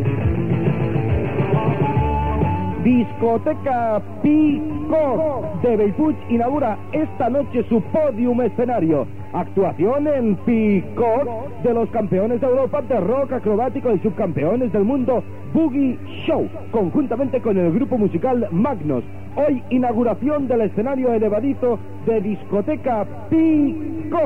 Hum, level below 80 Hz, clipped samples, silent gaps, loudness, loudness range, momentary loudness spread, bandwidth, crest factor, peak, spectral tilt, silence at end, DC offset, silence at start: none; -38 dBFS; under 0.1%; none; -20 LUFS; 1 LU; 5 LU; 4.4 kHz; 12 dB; -6 dBFS; -10.5 dB/octave; 0 s; 2%; 0 s